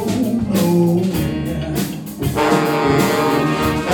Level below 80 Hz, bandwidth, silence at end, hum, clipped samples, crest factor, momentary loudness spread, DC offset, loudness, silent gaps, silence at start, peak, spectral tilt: -36 dBFS; 19 kHz; 0 s; none; under 0.1%; 14 dB; 7 LU; under 0.1%; -17 LUFS; none; 0 s; -2 dBFS; -6 dB/octave